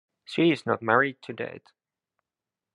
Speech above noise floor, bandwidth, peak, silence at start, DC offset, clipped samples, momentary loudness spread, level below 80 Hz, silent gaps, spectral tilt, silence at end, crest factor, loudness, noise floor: 64 dB; 10.5 kHz; -6 dBFS; 0.3 s; under 0.1%; under 0.1%; 13 LU; -76 dBFS; none; -6.5 dB/octave; 1.15 s; 24 dB; -26 LUFS; -90 dBFS